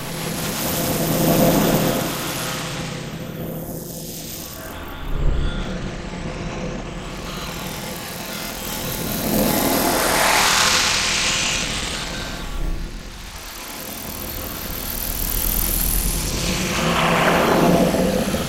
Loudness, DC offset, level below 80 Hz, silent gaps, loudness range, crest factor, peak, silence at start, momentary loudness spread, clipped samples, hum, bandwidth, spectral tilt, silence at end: -21 LUFS; under 0.1%; -32 dBFS; none; 11 LU; 20 dB; -2 dBFS; 0 s; 14 LU; under 0.1%; none; 17 kHz; -3.5 dB/octave; 0 s